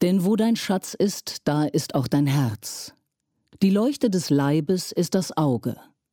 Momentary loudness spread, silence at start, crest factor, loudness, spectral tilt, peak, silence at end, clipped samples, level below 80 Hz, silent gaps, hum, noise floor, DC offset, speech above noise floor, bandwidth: 10 LU; 0 s; 14 dB; -23 LUFS; -6 dB/octave; -10 dBFS; 0.4 s; under 0.1%; -64 dBFS; none; none; -75 dBFS; under 0.1%; 53 dB; 17.5 kHz